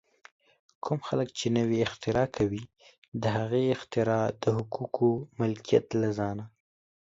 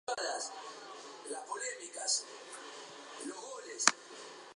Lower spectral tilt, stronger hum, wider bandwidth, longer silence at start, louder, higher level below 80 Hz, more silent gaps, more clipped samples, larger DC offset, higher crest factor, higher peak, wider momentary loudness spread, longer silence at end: first, -6.5 dB/octave vs 1 dB/octave; neither; second, 7.8 kHz vs 11 kHz; first, 0.85 s vs 0.05 s; first, -29 LUFS vs -36 LUFS; first, -58 dBFS vs under -90 dBFS; first, 2.98-3.02 s, 3.08-3.12 s vs none; neither; neither; second, 20 dB vs 36 dB; second, -10 dBFS vs -4 dBFS; second, 8 LU vs 18 LU; first, 0.55 s vs 0 s